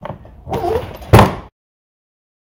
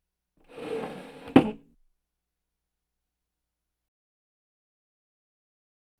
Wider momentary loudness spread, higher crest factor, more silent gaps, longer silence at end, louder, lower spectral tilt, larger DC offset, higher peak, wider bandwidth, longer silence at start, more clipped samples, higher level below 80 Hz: about the same, 21 LU vs 20 LU; second, 18 dB vs 30 dB; neither; second, 1.05 s vs 4.4 s; first, -15 LUFS vs -26 LUFS; about the same, -6.5 dB/octave vs -7.5 dB/octave; neither; first, 0 dBFS vs -4 dBFS; first, 17 kHz vs 12 kHz; second, 0 s vs 0.55 s; first, 0.4% vs under 0.1%; first, -30 dBFS vs -64 dBFS